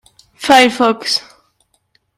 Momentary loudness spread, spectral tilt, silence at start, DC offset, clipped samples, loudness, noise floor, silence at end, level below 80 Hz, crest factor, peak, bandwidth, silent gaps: 10 LU; -2 dB/octave; 0.4 s; under 0.1%; under 0.1%; -13 LUFS; -61 dBFS; 0.95 s; -56 dBFS; 16 dB; 0 dBFS; 16 kHz; none